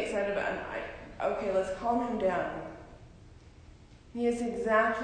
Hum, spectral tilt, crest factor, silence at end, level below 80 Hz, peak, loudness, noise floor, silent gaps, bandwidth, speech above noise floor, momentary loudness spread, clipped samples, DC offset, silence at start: none; -5.5 dB/octave; 18 dB; 0 s; -54 dBFS; -14 dBFS; -32 LUFS; -53 dBFS; none; 10 kHz; 23 dB; 15 LU; under 0.1%; under 0.1%; 0 s